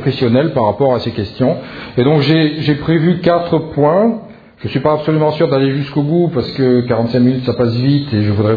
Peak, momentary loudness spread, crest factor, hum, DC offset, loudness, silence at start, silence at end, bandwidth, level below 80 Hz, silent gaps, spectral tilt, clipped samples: 0 dBFS; 5 LU; 14 dB; none; under 0.1%; -14 LUFS; 0 s; 0 s; 5 kHz; -46 dBFS; none; -9.5 dB/octave; under 0.1%